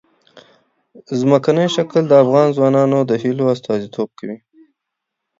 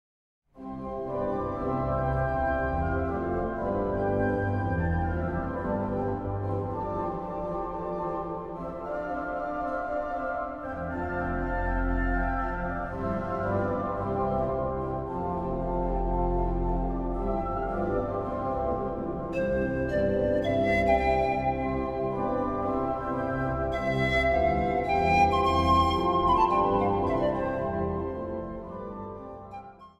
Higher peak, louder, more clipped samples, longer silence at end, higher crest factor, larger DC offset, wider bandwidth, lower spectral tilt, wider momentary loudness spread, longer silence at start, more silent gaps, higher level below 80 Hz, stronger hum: first, 0 dBFS vs -10 dBFS; first, -15 LUFS vs -28 LUFS; neither; first, 1.05 s vs 0.1 s; about the same, 16 dB vs 18 dB; neither; second, 7.8 kHz vs 10 kHz; about the same, -7 dB/octave vs -8 dB/octave; first, 14 LU vs 10 LU; second, 0.35 s vs 0.55 s; neither; second, -64 dBFS vs -38 dBFS; neither